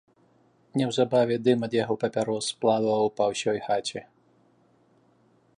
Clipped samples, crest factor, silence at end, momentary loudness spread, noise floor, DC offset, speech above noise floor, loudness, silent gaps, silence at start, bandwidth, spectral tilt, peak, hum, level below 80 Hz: under 0.1%; 18 dB; 1.55 s; 6 LU; -63 dBFS; under 0.1%; 38 dB; -26 LUFS; none; 0.75 s; 11 kHz; -5 dB/octave; -8 dBFS; none; -70 dBFS